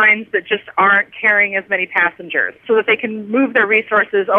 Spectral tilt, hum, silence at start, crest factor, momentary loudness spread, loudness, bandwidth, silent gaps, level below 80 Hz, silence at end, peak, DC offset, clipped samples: -7 dB/octave; none; 0 s; 14 dB; 6 LU; -15 LUFS; 4.2 kHz; none; -68 dBFS; 0 s; -2 dBFS; under 0.1%; under 0.1%